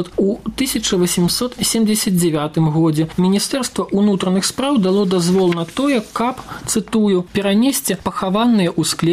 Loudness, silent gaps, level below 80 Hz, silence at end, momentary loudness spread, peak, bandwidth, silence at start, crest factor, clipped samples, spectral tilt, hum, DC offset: -17 LUFS; none; -46 dBFS; 0 s; 5 LU; -6 dBFS; 16 kHz; 0 s; 10 dB; under 0.1%; -5 dB/octave; none; under 0.1%